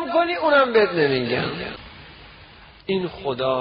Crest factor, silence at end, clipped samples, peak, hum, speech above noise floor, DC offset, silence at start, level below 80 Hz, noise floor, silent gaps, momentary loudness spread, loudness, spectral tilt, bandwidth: 16 dB; 0 s; under 0.1%; -6 dBFS; none; 25 dB; under 0.1%; 0 s; -52 dBFS; -46 dBFS; none; 21 LU; -21 LUFS; -3 dB/octave; 5.4 kHz